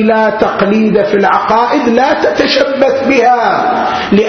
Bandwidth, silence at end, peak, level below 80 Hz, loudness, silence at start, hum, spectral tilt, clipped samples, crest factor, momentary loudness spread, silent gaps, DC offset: 6.6 kHz; 0 s; 0 dBFS; -44 dBFS; -10 LUFS; 0 s; none; -5.5 dB/octave; 0.1%; 10 dB; 2 LU; none; under 0.1%